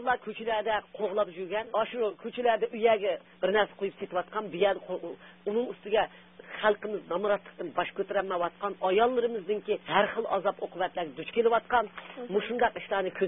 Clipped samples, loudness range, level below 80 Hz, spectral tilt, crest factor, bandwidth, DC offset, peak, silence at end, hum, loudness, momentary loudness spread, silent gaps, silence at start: under 0.1%; 2 LU; -66 dBFS; -8.5 dB/octave; 20 dB; 3.9 kHz; under 0.1%; -10 dBFS; 0 s; none; -30 LUFS; 8 LU; none; 0 s